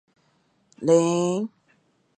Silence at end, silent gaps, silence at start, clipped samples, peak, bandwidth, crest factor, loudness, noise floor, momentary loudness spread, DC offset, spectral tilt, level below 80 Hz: 0.7 s; none; 0.8 s; under 0.1%; -6 dBFS; 9.2 kHz; 20 dB; -22 LUFS; -66 dBFS; 11 LU; under 0.1%; -6 dB/octave; -72 dBFS